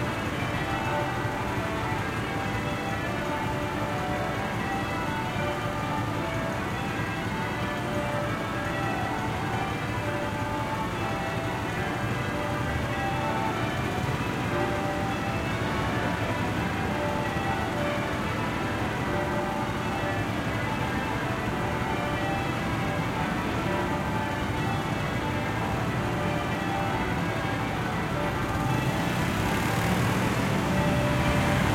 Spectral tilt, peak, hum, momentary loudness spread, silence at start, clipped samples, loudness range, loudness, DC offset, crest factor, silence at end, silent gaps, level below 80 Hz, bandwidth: -5.5 dB/octave; -12 dBFS; none; 4 LU; 0 s; under 0.1%; 2 LU; -28 LUFS; under 0.1%; 16 dB; 0 s; none; -44 dBFS; 16.5 kHz